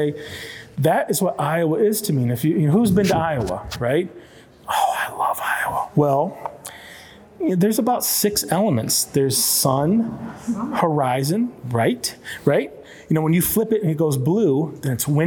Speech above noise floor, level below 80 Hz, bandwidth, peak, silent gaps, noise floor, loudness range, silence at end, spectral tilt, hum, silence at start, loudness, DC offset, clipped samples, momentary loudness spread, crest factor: 23 dB; -50 dBFS; over 20 kHz; -4 dBFS; none; -43 dBFS; 4 LU; 0 s; -5 dB/octave; none; 0 s; -20 LUFS; under 0.1%; under 0.1%; 10 LU; 18 dB